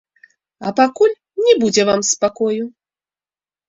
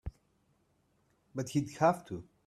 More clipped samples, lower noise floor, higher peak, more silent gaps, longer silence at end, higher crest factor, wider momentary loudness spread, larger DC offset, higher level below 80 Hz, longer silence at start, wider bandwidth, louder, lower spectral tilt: neither; first, under -90 dBFS vs -73 dBFS; first, -2 dBFS vs -14 dBFS; neither; first, 1 s vs 0.25 s; second, 16 dB vs 22 dB; second, 10 LU vs 16 LU; neither; second, -62 dBFS vs -56 dBFS; first, 0.6 s vs 0.05 s; second, 8 kHz vs 14 kHz; first, -16 LUFS vs -33 LUFS; second, -3 dB/octave vs -6.5 dB/octave